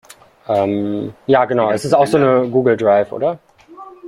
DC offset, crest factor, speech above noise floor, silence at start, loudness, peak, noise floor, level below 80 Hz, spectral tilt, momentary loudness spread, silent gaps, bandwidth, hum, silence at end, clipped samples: under 0.1%; 14 dB; 24 dB; 0.5 s; -16 LUFS; -2 dBFS; -39 dBFS; -56 dBFS; -6.5 dB/octave; 8 LU; none; 14.5 kHz; none; 0 s; under 0.1%